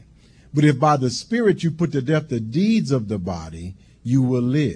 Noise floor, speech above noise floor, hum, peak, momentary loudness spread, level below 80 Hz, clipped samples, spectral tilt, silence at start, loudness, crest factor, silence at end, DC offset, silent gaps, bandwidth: -50 dBFS; 30 dB; none; -4 dBFS; 13 LU; -50 dBFS; under 0.1%; -7 dB/octave; 0.55 s; -20 LUFS; 16 dB; 0 s; under 0.1%; none; 10.5 kHz